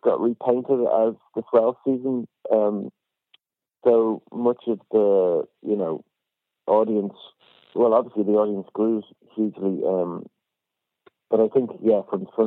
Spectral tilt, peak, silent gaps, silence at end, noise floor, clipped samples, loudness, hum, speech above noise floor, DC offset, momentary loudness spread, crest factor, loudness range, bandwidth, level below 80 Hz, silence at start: -11 dB/octave; -6 dBFS; none; 0 s; -84 dBFS; under 0.1%; -23 LUFS; none; 62 dB; under 0.1%; 10 LU; 18 dB; 2 LU; 4 kHz; -78 dBFS; 0.05 s